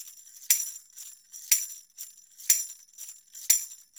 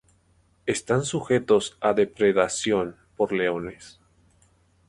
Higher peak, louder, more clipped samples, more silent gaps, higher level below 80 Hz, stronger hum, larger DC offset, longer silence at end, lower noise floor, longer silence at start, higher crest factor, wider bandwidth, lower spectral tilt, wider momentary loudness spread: about the same, -4 dBFS vs -6 dBFS; about the same, -25 LUFS vs -24 LUFS; neither; neither; second, under -90 dBFS vs -58 dBFS; neither; neither; second, 0.25 s vs 1 s; second, -48 dBFS vs -63 dBFS; second, 0 s vs 0.65 s; first, 28 dB vs 20 dB; first, over 20 kHz vs 11.5 kHz; second, 6 dB/octave vs -4.5 dB/octave; first, 20 LU vs 10 LU